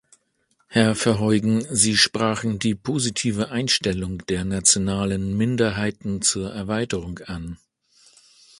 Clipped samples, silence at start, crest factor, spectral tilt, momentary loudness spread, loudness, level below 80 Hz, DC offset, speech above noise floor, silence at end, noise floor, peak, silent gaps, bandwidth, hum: under 0.1%; 0.7 s; 22 dB; -3.5 dB/octave; 10 LU; -21 LUFS; -46 dBFS; under 0.1%; 46 dB; 1.05 s; -68 dBFS; -2 dBFS; none; 11.5 kHz; none